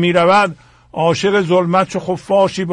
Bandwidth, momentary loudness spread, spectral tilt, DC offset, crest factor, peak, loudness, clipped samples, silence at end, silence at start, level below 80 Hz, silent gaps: 11 kHz; 8 LU; -5.5 dB/octave; under 0.1%; 12 dB; -2 dBFS; -15 LUFS; under 0.1%; 0 s; 0 s; -52 dBFS; none